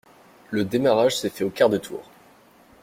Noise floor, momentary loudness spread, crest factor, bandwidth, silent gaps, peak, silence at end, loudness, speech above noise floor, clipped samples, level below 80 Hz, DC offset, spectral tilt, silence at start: -53 dBFS; 13 LU; 20 dB; 16.5 kHz; none; -4 dBFS; 0.8 s; -22 LUFS; 32 dB; under 0.1%; -62 dBFS; under 0.1%; -5 dB/octave; 0.5 s